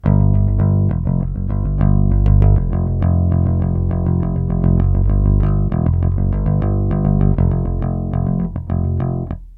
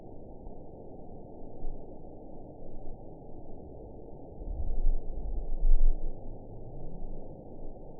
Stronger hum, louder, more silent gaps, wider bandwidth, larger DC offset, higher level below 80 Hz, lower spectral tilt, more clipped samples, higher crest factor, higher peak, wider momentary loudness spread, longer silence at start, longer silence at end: neither; first, -17 LUFS vs -41 LUFS; neither; first, 3 kHz vs 1 kHz; second, under 0.1% vs 0.2%; first, -20 dBFS vs -32 dBFS; second, -13 dB/octave vs -15 dB/octave; neither; about the same, 14 dB vs 18 dB; first, 0 dBFS vs -10 dBFS; second, 6 LU vs 14 LU; about the same, 0.05 s vs 0 s; about the same, 0 s vs 0 s